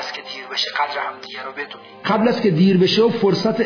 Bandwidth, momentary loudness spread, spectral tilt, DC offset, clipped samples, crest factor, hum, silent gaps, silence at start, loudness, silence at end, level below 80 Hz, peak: 5.4 kHz; 15 LU; -6 dB/octave; under 0.1%; under 0.1%; 14 dB; none; none; 0 s; -18 LUFS; 0 s; -64 dBFS; -4 dBFS